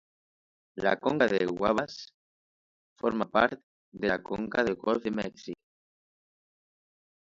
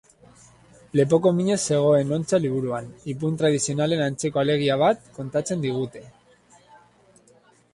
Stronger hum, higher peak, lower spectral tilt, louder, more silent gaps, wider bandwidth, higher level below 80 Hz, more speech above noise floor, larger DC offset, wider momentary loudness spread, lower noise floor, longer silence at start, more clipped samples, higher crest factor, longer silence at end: second, none vs 60 Hz at -50 dBFS; about the same, -8 dBFS vs -6 dBFS; about the same, -6 dB/octave vs -5.5 dB/octave; second, -29 LUFS vs -23 LUFS; first, 2.14-2.96 s, 3.63-3.92 s vs none; second, 7.8 kHz vs 11.5 kHz; about the same, -62 dBFS vs -60 dBFS; first, over 61 dB vs 35 dB; neither; first, 18 LU vs 10 LU; first, under -90 dBFS vs -57 dBFS; second, 0.75 s vs 0.95 s; neither; first, 24 dB vs 18 dB; about the same, 1.65 s vs 1.65 s